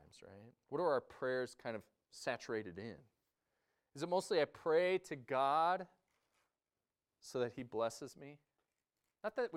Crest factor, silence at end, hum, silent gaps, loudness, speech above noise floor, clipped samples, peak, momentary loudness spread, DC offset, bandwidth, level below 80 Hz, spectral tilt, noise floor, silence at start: 18 dB; 0 s; none; none; -39 LUFS; over 50 dB; under 0.1%; -22 dBFS; 23 LU; under 0.1%; 14.5 kHz; -82 dBFS; -4.5 dB/octave; under -90 dBFS; 0.25 s